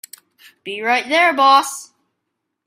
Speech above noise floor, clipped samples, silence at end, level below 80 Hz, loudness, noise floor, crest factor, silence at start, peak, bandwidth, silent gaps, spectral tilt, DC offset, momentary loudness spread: 61 dB; under 0.1%; 0.8 s; -74 dBFS; -14 LUFS; -76 dBFS; 18 dB; 0.65 s; -2 dBFS; 16 kHz; none; -1 dB/octave; under 0.1%; 19 LU